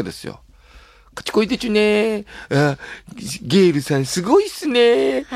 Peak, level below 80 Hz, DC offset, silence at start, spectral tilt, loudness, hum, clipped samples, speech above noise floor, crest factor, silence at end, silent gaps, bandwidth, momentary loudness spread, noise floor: -4 dBFS; -50 dBFS; under 0.1%; 0 s; -5 dB/octave; -18 LUFS; none; under 0.1%; 28 dB; 16 dB; 0 s; none; 15.5 kHz; 17 LU; -46 dBFS